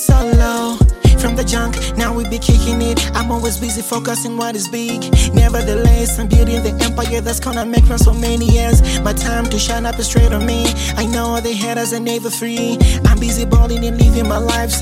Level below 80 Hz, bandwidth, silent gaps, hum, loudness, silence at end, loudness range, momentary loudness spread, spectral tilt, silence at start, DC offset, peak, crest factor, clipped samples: -16 dBFS; 16 kHz; none; none; -15 LUFS; 0 s; 2 LU; 7 LU; -5 dB/octave; 0 s; under 0.1%; 0 dBFS; 12 dB; under 0.1%